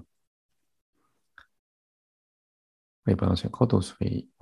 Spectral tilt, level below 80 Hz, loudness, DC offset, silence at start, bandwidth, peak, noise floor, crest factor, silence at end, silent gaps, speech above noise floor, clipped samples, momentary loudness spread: -7.5 dB/octave; -46 dBFS; -27 LUFS; under 0.1%; 3.05 s; 11.5 kHz; -6 dBFS; -59 dBFS; 26 dB; 0.2 s; none; 33 dB; under 0.1%; 7 LU